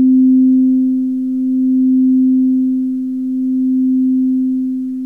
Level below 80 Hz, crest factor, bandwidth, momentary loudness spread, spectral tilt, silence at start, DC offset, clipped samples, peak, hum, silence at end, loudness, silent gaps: -58 dBFS; 8 dB; 0.5 kHz; 8 LU; -9.5 dB/octave; 0 s; 0.2%; under 0.1%; -6 dBFS; 60 Hz at -55 dBFS; 0 s; -14 LUFS; none